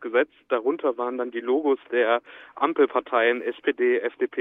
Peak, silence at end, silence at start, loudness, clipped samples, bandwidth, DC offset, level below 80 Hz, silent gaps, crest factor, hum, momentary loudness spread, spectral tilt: -6 dBFS; 0 s; 0 s; -24 LUFS; under 0.1%; 3.9 kHz; under 0.1%; -76 dBFS; none; 18 dB; none; 6 LU; -7 dB/octave